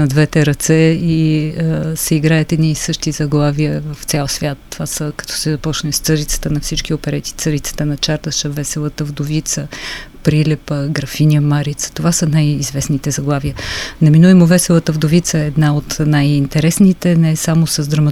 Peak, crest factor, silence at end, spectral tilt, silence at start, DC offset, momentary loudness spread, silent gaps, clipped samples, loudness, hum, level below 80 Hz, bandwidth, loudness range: 0 dBFS; 14 dB; 0 s; -5.5 dB/octave; 0 s; under 0.1%; 9 LU; none; under 0.1%; -15 LUFS; none; -34 dBFS; 15 kHz; 6 LU